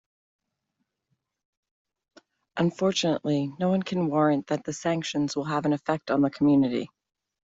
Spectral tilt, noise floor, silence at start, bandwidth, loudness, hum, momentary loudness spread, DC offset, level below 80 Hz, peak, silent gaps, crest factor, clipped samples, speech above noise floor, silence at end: -6 dB/octave; -80 dBFS; 2.55 s; 8 kHz; -26 LUFS; none; 6 LU; under 0.1%; -66 dBFS; -10 dBFS; none; 18 dB; under 0.1%; 55 dB; 0.7 s